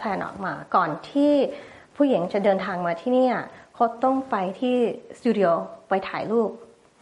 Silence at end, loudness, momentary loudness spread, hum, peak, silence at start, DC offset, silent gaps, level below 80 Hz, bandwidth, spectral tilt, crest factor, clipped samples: 0.35 s; -24 LUFS; 8 LU; none; -6 dBFS; 0 s; under 0.1%; none; -66 dBFS; 10.5 kHz; -7 dB/octave; 16 dB; under 0.1%